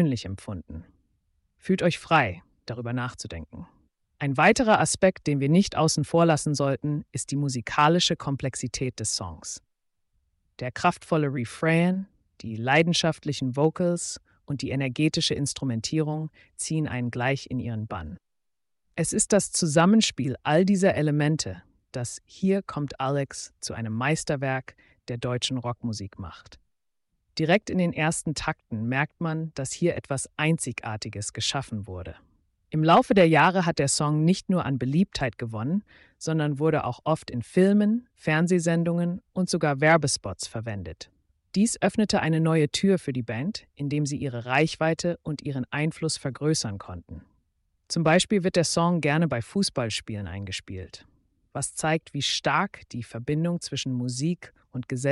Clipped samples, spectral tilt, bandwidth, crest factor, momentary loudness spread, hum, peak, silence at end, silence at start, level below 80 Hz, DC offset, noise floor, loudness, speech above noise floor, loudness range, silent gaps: under 0.1%; -5 dB/octave; 11.5 kHz; 18 dB; 15 LU; none; -8 dBFS; 0 s; 0 s; -54 dBFS; under 0.1%; -79 dBFS; -25 LUFS; 54 dB; 6 LU; none